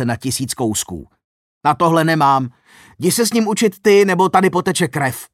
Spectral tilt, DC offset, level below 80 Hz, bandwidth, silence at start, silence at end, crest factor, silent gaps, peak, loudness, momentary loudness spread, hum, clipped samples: -4.5 dB/octave; under 0.1%; -54 dBFS; 16.5 kHz; 0 s; 0.1 s; 16 dB; 1.24-1.61 s; -2 dBFS; -16 LUFS; 9 LU; none; under 0.1%